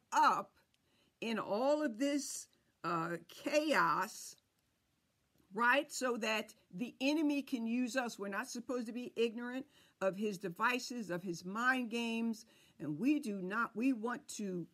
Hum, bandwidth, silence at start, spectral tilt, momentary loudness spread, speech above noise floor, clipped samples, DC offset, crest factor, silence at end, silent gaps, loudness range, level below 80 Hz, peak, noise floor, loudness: none; 15.5 kHz; 0.1 s; -4 dB/octave; 13 LU; 43 dB; under 0.1%; under 0.1%; 18 dB; 0.1 s; none; 3 LU; -86 dBFS; -18 dBFS; -80 dBFS; -37 LUFS